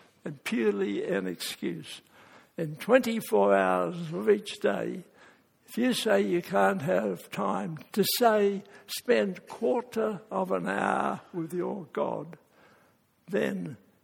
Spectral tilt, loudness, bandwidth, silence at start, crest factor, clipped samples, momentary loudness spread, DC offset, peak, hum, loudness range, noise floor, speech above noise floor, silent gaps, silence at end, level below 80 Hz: -5 dB/octave; -29 LUFS; 18 kHz; 0.25 s; 22 dB; under 0.1%; 13 LU; under 0.1%; -6 dBFS; none; 5 LU; -65 dBFS; 37 dB; none; 0.3 s; -74 dBFS